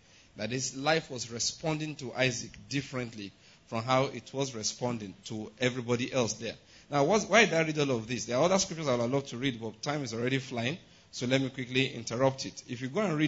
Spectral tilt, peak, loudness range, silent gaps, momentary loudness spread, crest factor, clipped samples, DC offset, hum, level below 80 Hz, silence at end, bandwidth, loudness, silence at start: -4 dB/octave; -10 dBFS; 5 LU; none; 12 LU; 22 dB; under 0.1%; under 0.1%; none; -64 dBFS; 0 s; 8 kHz; -31 LUFS; 0.35 s